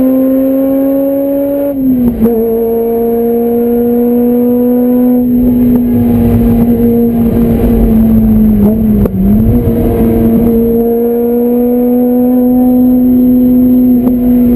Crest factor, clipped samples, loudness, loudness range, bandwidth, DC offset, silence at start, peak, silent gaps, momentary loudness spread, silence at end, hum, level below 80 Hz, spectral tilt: 8 dB; 0.1%; -9 LUFS; 2 LU; 13.5 kHz; under 0.1%; 0 s; 0 dBFS; none; 4 LU; 0 s; none; -22 dBFS; -10 dB/octave